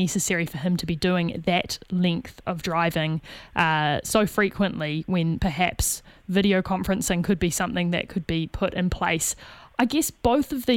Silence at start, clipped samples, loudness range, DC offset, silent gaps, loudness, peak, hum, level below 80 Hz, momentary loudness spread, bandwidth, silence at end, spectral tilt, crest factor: 0 s; under 0.1%; 1 LU; under 0.1%; none; -24 LUFS; -4 dBFS; none; -42 dBFS; 6 LU; 17 kHz; 0 s; -4.5 dB/octave; 20 dB